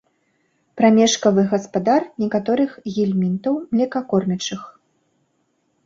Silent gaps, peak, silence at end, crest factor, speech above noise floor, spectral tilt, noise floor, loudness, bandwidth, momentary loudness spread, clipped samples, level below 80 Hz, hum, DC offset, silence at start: none; -2 dBFS; 1.15 s; 18 dB; 49 dB; -5.5 dB/octave; -67 dBFS; -19 LUFS; 7.8 kHz; 8 LU; under 0.1%; -62 dBFS; none; under 0.1%; 0.75 s